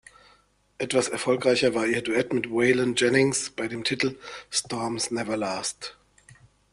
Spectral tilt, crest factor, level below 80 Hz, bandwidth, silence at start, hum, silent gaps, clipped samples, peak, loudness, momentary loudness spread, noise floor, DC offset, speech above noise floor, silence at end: -3.5 dB/octave; 20 dB; -62 dBFS; 12 kHz; 0.8 s; 50 Hz at -60 dBFS; none; under 0.1%; -6 dBFS; -25 LUFS; 9 LU; -62 dBFS; under 0.1%; 37 dB; 0.8 s